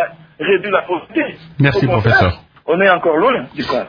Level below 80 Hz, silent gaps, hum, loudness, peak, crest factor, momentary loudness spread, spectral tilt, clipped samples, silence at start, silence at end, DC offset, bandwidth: -42 dBFS; none; none; -15 LUFS; 0 dBFS; 16 dB; 10 LU; -8 dB/octave; under 0.1%; 0 s; 0 s; under 0.1%; 5.2 kHz